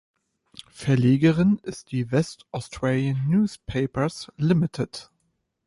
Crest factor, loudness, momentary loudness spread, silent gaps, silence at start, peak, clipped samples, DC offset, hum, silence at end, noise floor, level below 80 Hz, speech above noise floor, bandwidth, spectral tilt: 16 dB; -24 LUFS; 13 LU; none; 0.75 s; -8 dBFS; under 0.1%; under 0.1%; none; 0.65 s; -74 dBFS; -52 dBFS; 51 dB; 11.5 kHz; -7.5 dB/octave